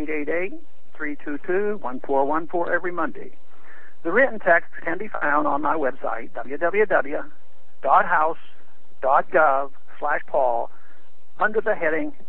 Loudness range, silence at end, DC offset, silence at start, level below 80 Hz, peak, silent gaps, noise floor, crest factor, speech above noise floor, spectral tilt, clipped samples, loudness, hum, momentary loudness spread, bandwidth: 4 LU; 0.15 s; 7%; 0 s; -64 dBFS; -4 dBFS; none; -58 dBFS; 20 dB; 35 dB; -9 dB/octave; under 0.1%; -23 LUFS; none; 13 LU; 4.2 kHz